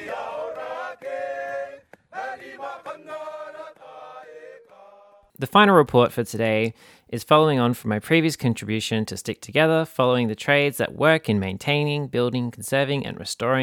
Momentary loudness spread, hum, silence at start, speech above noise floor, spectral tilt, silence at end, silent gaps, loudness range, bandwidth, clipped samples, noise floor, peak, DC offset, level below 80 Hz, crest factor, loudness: 19 LU; none; 0 s; 31 dB; -5.5 dB/octave; 0 s; none; 15 LU; over 20 kHz; under 0.1%; -52 dBFS; -2 dBFS; under 0.1%; -62 dBFS; 20 dB; -22 LUFS